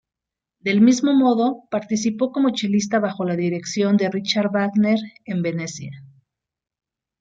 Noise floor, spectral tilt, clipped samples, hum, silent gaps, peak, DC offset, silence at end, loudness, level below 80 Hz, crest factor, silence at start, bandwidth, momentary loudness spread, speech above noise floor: -86 dBFS; -5.5 dB/octave; under 0.1%; none; none; -4 dBFS; under 0.1%; 1.15 s; -20 LUFS; -66 dBFS; 16 dB; 0.65 s; 7.8 kHz; 11 LU; 66 dB